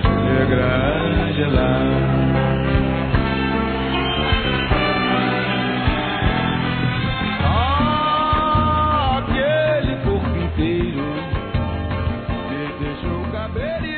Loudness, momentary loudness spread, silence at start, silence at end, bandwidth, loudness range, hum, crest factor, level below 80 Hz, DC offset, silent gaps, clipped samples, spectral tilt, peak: -19 LUFS; 7 LU; 0 s; 0 s; 4.5 kHz; 5 LU; none; 14 dB; -28 dBFS; under 0.1%; none; under 0.1%; -4.5 dB/octave; -4 dBFS